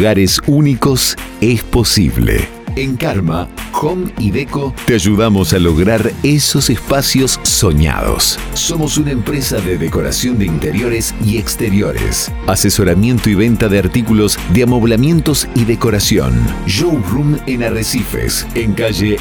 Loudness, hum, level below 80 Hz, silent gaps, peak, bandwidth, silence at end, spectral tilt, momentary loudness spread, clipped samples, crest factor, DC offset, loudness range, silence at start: -13 LUFS; none; -24 dBFS; none; 0 dBFS; over 20 kHz; 0 s; -4.5 dB/octave; 6 LU; under 0.1%; 12 dB; 0.2%; 3 LU; 0 s